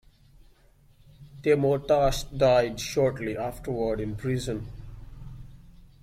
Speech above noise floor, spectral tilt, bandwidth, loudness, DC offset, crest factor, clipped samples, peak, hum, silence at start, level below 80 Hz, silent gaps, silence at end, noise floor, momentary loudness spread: 33 dB; -5.5 dB/octave; 16 kHz; -26 LUFS; under 0.1%; 18 dB; under 0.1%; -10 dBFS; none; 1.2 s; -44 dBFS; none; 0.2 s; -58 dBFS; 23 LU